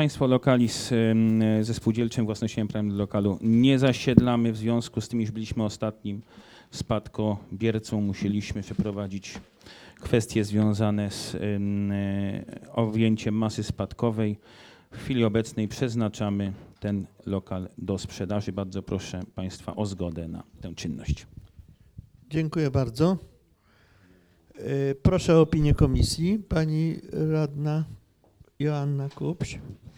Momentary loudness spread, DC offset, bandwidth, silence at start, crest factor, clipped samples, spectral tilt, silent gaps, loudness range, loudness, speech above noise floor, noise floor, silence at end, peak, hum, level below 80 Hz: 13 LU; under 0.1%; 15 kHz; 0 s; 26 dB; under 0.1%; -7 dB/octave; none; 8 LU; -27 LUFS; 36 dB; -61 dBFS; 0.1 s; 0 dBFS; none; -42 dBFS